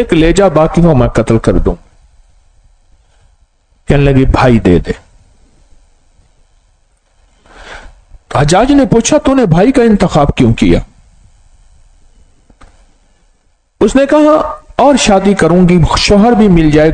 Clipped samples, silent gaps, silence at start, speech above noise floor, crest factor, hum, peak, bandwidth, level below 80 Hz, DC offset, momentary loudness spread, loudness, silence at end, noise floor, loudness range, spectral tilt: 2%; none; 0 s; 46 dB; 10 dB; none; 0 dBFS; 9.6 kHz; -22 dBFS; under 0.1%; 8 LU; -8 LUFS; 0 s; -53 dBFS; 9 LU; -6 dB/octave